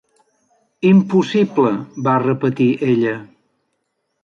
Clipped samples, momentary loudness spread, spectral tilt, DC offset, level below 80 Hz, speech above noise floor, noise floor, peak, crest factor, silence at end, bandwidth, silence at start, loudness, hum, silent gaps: under 0.1%; 7 LU; -8 dB/octave; under 0.1%; -62 dBFS; 56 dB; -71 dBFS; -4 dBFS; 14 dB; 1 s; 7.2 kHz; 0.8 s; -16 LUFS; none; none